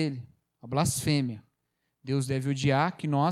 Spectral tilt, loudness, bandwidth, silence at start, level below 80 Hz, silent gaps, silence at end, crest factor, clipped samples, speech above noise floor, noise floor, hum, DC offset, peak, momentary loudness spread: -5.5 dB/octave; -28 LUFS; 15 kHz; 0 s; -58 dBFS; none; 0 s; 18 dB; under 0.1%; 52 dB; -79 dBFS; none; under 0.1%; -10 dBFS; 14 LU